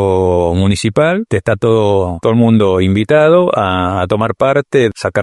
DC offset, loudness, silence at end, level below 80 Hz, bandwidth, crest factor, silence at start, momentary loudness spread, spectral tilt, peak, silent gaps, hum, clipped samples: under 0.1%; -12 LUFS; 0 s; -38 dBFS; 11.5 kHz; 12 dB; 0 s; 5 LU; -7 dB/octave; 0 dBFS; none; none; under 0.1%